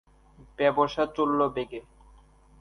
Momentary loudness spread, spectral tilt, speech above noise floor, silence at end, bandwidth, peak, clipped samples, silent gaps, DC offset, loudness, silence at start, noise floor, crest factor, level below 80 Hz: 13 LU; -6.5 dB/octave; 30 dB; 0.8 s; 10.5 kHz; -8 dBFS; under 0.1%; none; under 0.1%; -26 LUFS; 0.6 s; -56 dBFS; 20 dB; -56 dBFS